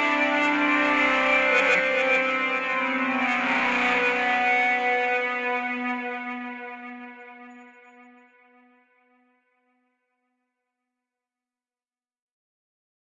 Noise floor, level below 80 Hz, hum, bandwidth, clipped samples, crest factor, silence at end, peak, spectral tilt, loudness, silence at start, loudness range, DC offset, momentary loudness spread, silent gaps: under -90 dBFS; -64 dBFS; none; 8.6 kHz; under 0.1%; 18 dB; 5.4 s; -8 dBFS; -3 dB/octave; -22 LUFS; 0 s; 16 LU; under 0.1%; 16 LU; none